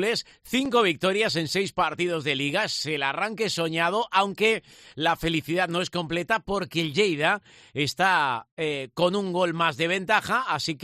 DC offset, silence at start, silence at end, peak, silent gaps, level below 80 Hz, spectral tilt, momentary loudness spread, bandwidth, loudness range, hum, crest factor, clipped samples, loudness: under 0.1%; 0 s; 0 s; -6 dBFS; 8.51-8.57 s; -56 dBFS; -4 dB/octave; 7 LU; 14 kHz; 1 LU; none; 18 dB; under 0.1%; -25 LUFS